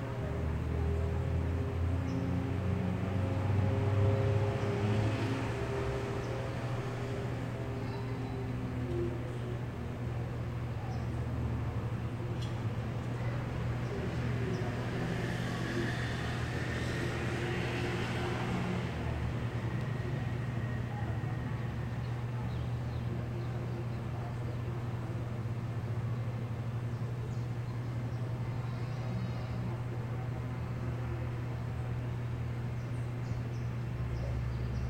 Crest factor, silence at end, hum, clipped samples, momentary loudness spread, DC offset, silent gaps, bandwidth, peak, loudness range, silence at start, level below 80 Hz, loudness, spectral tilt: 16 dB; 0 s; none; under 0.1%; 5 LU; under 0.1%; none; 9.6 kHz; -18 dBFS; 5 LU; 0 s; -46 dBFS; -36 LUFS; -7.5 dB/octave